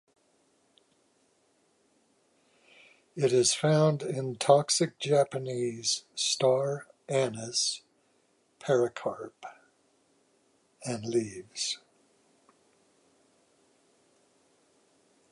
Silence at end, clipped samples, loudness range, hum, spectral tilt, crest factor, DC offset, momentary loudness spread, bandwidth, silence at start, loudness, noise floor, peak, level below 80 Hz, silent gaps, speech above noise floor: 3.55 s; under 0.1%; 11 LU; none; -4 dB/octave; 24 dB; under 0.1%; 16 LU; 11.5 kHz; 3.15 s; -28 LUFS; -70 dBFS; -8 dBFS; -76 dBFS; none; 42 dB